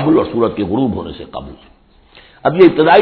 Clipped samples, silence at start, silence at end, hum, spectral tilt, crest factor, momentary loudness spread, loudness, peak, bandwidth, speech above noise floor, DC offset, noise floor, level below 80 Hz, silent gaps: 0.3%; 0 s; 0 s; none; -9.5 dB/octave; 14 dB; 19 LU; -13 LUFS; 0 dBFS; 5.2 kHz; 33 dB; under 0.1%; -45 dBFS; -42 dBFS; none